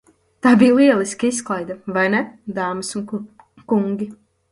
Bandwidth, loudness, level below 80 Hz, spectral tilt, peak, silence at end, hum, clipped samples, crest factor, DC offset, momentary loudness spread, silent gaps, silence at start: 11.5 kHz; -18 LUFS; -60 dBFS; -5 dB/octave; 0 dBFS; 0.35 s; none; under 0.1%; 18 dB; under 0.1%; 15 LU; none; 0.45 s